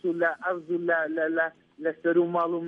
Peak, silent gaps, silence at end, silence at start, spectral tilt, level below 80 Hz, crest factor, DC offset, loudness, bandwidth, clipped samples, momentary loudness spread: -12 dBFS; none; 0 s; 0.05 s; -8.5 dB/octave; -80 dBFS; 14 dB; under 0.1%; -27 LUFS; 3.7 kHz; under 0.1%; 7 LU